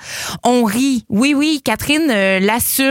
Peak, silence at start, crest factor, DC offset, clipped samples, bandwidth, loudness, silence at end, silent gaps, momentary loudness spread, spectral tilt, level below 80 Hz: -2 dBFS; 0 s; 14 dB; under 0.1%; under 0.1%; 17 kHz; -15 LUFS; 0 s; none; 4 LU; -3.5 dB/octave; -46 dBFS